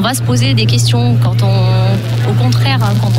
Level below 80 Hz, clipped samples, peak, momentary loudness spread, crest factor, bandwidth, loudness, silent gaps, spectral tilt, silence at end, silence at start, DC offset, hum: -36 dBFS; under 0.1%; -4 dBFS; 2 LU; 8 dB; 14.5 kHz; -12 LUFS; none; -5.5 dB/octave; 0 s; 0 s; under 0.1%; none